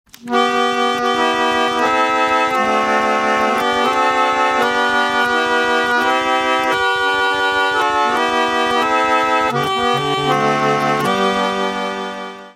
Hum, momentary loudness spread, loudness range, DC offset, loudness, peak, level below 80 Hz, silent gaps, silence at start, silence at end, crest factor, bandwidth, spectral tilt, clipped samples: none; 2 LU; 1 LU; under 0.1%; -15 LUFS; -2 dBFS; -52 dBFS; none; 0.25 s; 0.05 s; 14 dB; 16 kHz; -3.5 dB/octave; under 0.1%